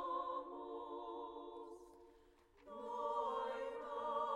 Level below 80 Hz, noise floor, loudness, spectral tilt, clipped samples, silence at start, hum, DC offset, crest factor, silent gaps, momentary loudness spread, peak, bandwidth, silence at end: -76 dBFS; -68 dBFS; -45 LUFS; -4.5 dB/octave; under 0.1%; 0 s; none; under 0.1%; 16 dB; none; 16 LU; -30 dBFS; 12 kHz; 0 s